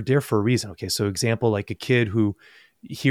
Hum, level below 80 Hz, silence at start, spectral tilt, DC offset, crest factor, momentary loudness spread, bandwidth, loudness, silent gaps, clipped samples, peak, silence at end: none; -56 dBFS; 0 s; -5.5 dB/octave; under 0.1%; 18 dB; 6 LU; 16 kHz; -23 LUFS; none; under 0.1%; -6 dBFS; 0 s